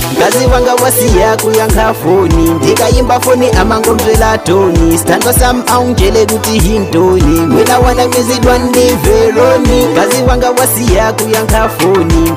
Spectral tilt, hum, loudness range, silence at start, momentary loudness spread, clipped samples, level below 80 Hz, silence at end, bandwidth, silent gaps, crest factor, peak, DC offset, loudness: -4.5 dB/octave; none; 1 LU; 0 s; 2 LU; 0.5%; -18 dBFS; 0 s; 16.5 kHz; none; 8 dB; 0 dBFS; under 0.1%; -9 LUFS